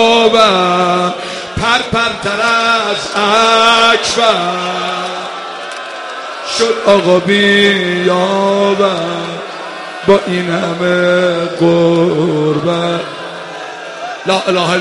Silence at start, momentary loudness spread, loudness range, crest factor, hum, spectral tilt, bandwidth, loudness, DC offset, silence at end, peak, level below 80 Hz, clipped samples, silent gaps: 0 s; 15 LU; 3 LU; 12 dB; none; -4 dB/octave; 11.5 kHz; -12 LUFS; under 0.1%; 0 s; 0 dBFS; -46 dBFS; under 0.1%; none